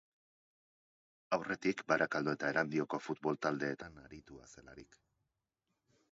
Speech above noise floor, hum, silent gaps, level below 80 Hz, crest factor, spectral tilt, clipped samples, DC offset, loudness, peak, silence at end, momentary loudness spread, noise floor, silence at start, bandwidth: 49 dB; none; none; -72 dBFS; 24 dB; -4 dB/octave; under 0.1%; under 0.1%; -36 LUFS; -16 dBFS; 1.3 s; 22 LU; -87 dBFS; 1.3 s; 7.6 kHz